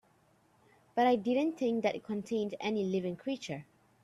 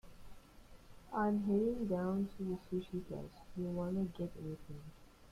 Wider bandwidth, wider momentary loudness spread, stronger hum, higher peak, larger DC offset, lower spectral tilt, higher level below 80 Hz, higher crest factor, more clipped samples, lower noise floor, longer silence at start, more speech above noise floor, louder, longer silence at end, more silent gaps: second, 12.5 kHz vs 14.5 kHz; second, 10 LU vs 15 LU; neither; first, -16 dBFS vs -24 dBFS; neither; second, -6 dB/octave vs -8.5 dB/octave; second, -76 dBFS vs -60 dBFS; about the same, 18 dB vs 16 dB; neither; first, -68 dBFS vs -58 dBFS; first, 0.95 s vs 0.05 s; first, 36 dB vs 20 dB; first, -33 LUFS vs -39 LUFS; first, 0.4 s vs 0 s; neither